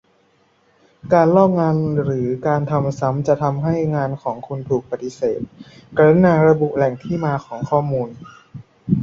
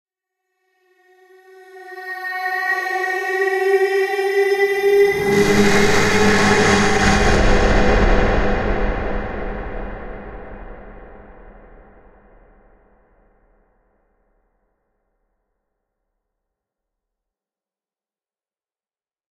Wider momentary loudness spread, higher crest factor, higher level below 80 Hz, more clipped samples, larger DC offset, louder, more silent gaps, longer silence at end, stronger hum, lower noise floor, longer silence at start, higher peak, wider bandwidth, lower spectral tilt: second, 13 LU vs 19 LU; about the same, 16 dB vs 18 dB; second, -50 dBFS vs -28 dBFS; neither; neither; about the same, -18 LUFS vs -17 LUFS; neither; second, 0 s vs 7.8 s; neither; second, -59 dBFS vs under -90 dBFS; second, 1.05 s vs 1.75 s; about the same, -2 dBFS vs -2 dBFS; second, 7.4 kHz vs 14.5 kHz; first, -9 dB/octave vs -4.5 dB/octave